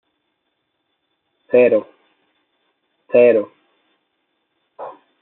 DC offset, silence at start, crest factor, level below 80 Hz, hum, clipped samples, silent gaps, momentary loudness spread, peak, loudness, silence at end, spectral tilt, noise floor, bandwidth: under 0.1%; 1.55 s; 18 dB; -74 dBFS; none; under 0.1%; none; 23 LU; -2 dBFS; -15 LUFS; 0.3 s; -5.5 dB/octave; -72 dBFS; 4 kHz